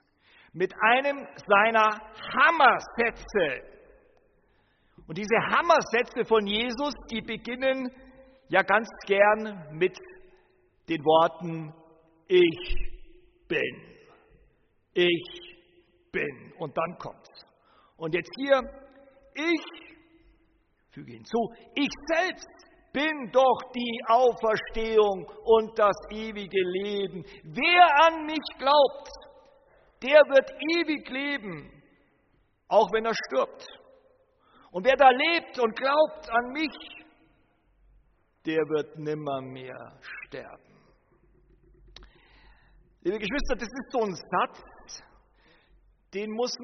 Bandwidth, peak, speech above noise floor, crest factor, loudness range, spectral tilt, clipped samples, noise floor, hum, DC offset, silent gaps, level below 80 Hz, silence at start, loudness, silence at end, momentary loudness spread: 6.4 kHz; -6 dBFS; 42 dB; 22 dB; 11 LU; -2 dB/octave; under 0.1%; -68 dBFS; none; under 0.1%; none; -50 dBFS; 0.55 s; -25 LUFS; 0 s; 20 LU